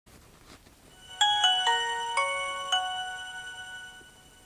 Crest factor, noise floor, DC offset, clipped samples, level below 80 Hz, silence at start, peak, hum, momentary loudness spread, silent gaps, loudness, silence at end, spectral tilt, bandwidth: 20 dB; -54 dBFS; under 0.1%; under 0.1%; -64 dBFS; 0.15 s; -10 dBFS; none; 19 LU; none; -26 LUFS; 0.35 s; 1.5 dB/octave; 16 kHz